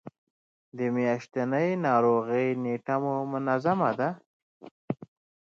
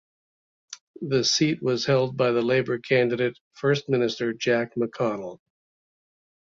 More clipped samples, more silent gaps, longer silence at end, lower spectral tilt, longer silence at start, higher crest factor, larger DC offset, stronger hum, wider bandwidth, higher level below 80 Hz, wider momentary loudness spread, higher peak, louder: neither; first, 0.18-0.72 s, 4.26-4.60 s, 4.71-4.88 s vs 0.81-0.94 s, 3.40-3.51 s; second, 0.5 s vs 1.15 s; first, -8 dB/octave vs -4.5 dB/octave; second, 0.05 s vs 0.7 s; about the same, 18 dB vs 16 dB; neither; neither; about the same, 7.2 kHz vs 7.6 kHz; second, -76 dBFS vs -66 dBFS; about the same, 14 LU vs 13 LU; about the same, -10 dBFS vs -8 dBFS; second, -28 LUFS vs -24 LUFS